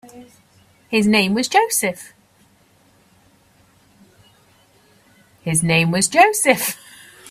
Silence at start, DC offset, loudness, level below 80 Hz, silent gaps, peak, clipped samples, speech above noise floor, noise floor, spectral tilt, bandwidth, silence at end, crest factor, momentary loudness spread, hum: 0.15 s; under 0.1%; -16 LUFS; -60 dBFS; none; 0 dBFS; under 0.1%; 39 dB; -55 dBFS; -3.5 dB/octave; 16 kHz; 0 s; 20 dB; 11 LU; none